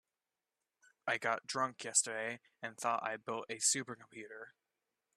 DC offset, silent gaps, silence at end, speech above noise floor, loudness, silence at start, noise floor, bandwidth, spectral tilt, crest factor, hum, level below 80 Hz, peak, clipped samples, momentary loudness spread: under 0.1%; none; 0.65 s; over 51 dB; -36 LUFS; 1.05 s; under -90 dBFS; 13.5 kHz; -1 dB/octave; 26 dB; none; -88 dBFS; -14 dBFS; under 0.1%; 17 LU